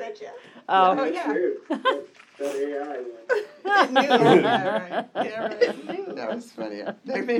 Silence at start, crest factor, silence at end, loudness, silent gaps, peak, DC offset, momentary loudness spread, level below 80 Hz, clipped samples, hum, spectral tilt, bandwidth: 0 s; 22 dB; 0 s; -23 LUFS; none; -2 dBFS; under 0.1%; 16 LU; -82 dBFS; under 0.1%; none; -5.5 dB/octave; 16 kHz